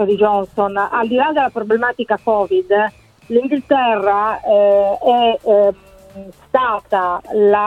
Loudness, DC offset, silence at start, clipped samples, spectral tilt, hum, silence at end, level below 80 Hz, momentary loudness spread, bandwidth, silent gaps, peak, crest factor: -16 LUFS; under 0.1%; 0 s; under 0.1%; -6.5 dB/octave; none; 0 s; -52 dBFS; 5 LU; 7.4 kHz; none; -2 dBFS; 14 dB